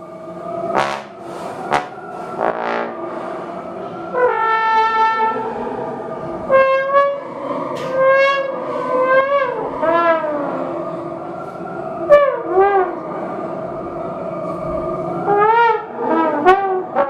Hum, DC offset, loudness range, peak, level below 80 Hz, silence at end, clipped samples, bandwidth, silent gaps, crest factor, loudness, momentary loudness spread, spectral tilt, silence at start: none; under 0.1%; 5 LU; 0 dBFS; -52 dBFS; 0 s; under 0.1%; 10.5 kHz; none; 18 dB; -18 LUFS; 14 LU; -6 dB/octave; 0 s